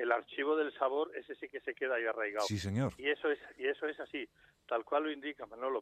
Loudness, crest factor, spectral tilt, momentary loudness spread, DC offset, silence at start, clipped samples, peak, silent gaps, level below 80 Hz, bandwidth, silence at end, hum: -36 LUFS; 22 dB; -5.5 dB/octave; 9 LU; under 0.1%; 0 s; under 0.1%; -14 dBFS; none; -72 dBFS; 13.5 kHz; 0 s; none